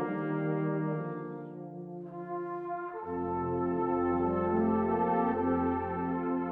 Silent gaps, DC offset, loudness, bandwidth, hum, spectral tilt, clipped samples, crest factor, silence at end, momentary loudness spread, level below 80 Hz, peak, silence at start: none; under 0.1%; -32 LUFS; 3.7 kHz; none; -11.5 dB/octave; under 0.1%; 16 dB; 0 s; 13 LU; -60 dBFS; -16 dBFS; 0 s